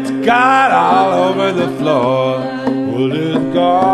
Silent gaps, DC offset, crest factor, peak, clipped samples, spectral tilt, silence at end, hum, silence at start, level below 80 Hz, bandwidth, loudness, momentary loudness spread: none; 0.1%; 12 dB; 0 dBFS; under 0.1%; -6 dB/octave; 0 s; none; 0 s; -54 dBFS; 12.5 kHz; -13 LUFS; 7 LU